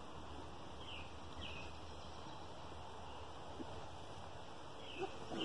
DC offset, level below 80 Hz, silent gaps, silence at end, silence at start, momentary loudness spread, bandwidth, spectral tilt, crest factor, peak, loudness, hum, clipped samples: 0.2%; -64 dBFS; none; 0 s; 0 s; 5 LU; 11 kHz; -4.5 dB/octave; 20 dB; -30 dBFS; -51 LUFS; none; under 0.1%